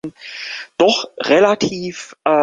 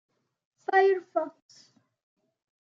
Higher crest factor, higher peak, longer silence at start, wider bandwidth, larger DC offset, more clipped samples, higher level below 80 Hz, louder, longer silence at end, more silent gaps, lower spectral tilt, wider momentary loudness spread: about the same, 16 dB vs 20 dB; first, -2 dBFS vs -12 dBFS; second, 0.05 s vs 0.7 s; first, 9.6 kHz vs 7 kHz; neither; neither; first, -58 dBFS vs under -90 dBFS; first, -17 LUFS vs -26 LUFS; second, 0 s vs 1.35 s; neither; about the same, -4 dB/octave vs -4 dB/octave; about the same, 15 LU vs 16 LU